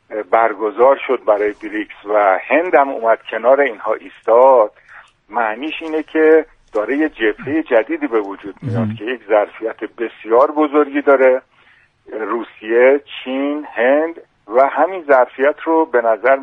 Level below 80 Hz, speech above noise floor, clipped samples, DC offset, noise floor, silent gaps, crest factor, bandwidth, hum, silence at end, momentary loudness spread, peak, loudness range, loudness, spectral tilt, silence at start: -58 dBFS; 37 dB; under 0.1%; under 0.1%; -52 dBFS; none; 16 dB; 3.9 kHz; none; 0 s; 12 LU; 0 dBFS; 3 LU; -16 LUFS; -8 dB/octave; 0.1 s